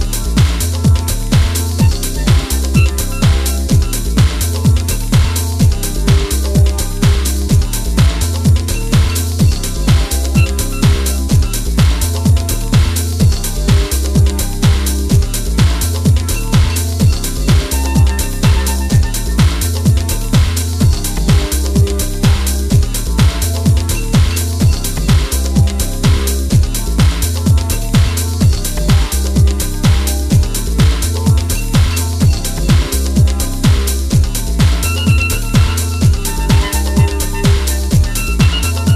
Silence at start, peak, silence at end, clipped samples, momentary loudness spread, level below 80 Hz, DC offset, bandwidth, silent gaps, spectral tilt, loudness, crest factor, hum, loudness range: 0 s; -2 dBFS; 0 s; under 0.1%; 2 LU; -16 dBFS; under 0.1%; 15.5 kHz; none; -5 dB/octave; -14 LUFS; 10 dB; none; 0 LU